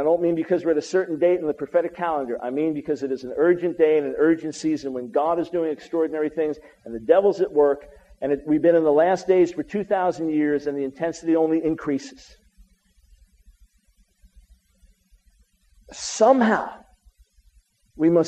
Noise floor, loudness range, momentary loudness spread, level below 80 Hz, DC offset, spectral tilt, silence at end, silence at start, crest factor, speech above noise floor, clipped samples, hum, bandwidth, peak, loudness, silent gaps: -62 dBFS; 6 LU; 10 LU; -58 dBFS; under 0.1%; -6 dB/octave; 0 s; 0 s; 20 dB; 40 dB; under 0.1%; none; 9.2 kHz; -2 dBFS; -22 LUFS; none